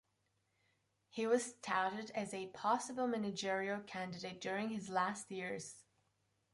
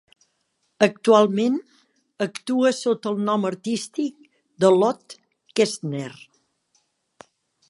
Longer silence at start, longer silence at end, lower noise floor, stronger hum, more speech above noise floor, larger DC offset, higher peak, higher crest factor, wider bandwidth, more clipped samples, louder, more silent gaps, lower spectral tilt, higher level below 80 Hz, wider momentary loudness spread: first, 1.15 s vs 0.8 s; second, 0.7 s vs 1.55 s; first, -82 dBFS vs -72 dBFS; neither; second, 42 dB vs 51 dB; neither; second, -22 dBFS vs -2 dBFS; about the same, 20 dB vs 22 dB; about the same, 11.5 kHz vs 11.5 kHz; neither; second, -40 LUFS vs -22 LUFS; neither; about the same, -4 dB/octave vs -5 dB/octave; second, -82 dBFS vs -74 dBFS; second, 9 LU vs 13 LU